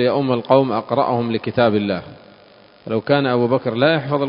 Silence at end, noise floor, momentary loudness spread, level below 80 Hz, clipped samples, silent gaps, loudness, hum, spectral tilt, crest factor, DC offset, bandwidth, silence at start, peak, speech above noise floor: 0 s; -47 dBFS; 8 LU; -56 dBFS; under 0.1%; none; -18 LUFS; none; -10.5 dB/octave; 18 dB; under 0.1%; 5.4 kHz; 0 s; 0 dBFS; 30 dB